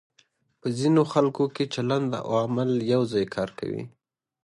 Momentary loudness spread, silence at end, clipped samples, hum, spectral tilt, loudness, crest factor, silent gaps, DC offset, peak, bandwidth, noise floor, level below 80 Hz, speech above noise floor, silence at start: 12 LU; 0.55 s; under 0.1%; none; -7 dB/octave; -26 LUFS; 18 dB; none; under 0.1%; -8 dBFS; 11.5 kHz; -65 dBFS; -64 dBFS; 41 dB; 0.65 s